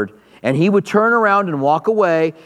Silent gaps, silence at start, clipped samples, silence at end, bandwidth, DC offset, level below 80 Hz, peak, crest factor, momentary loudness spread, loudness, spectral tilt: none; 0 s; under 0.1%; 0.15 s; 12 kHz; under 0.1%; -68 dBFS; 0 dBFS; 16 dB; 7 LU; -15 LUFS; -7 dB/octave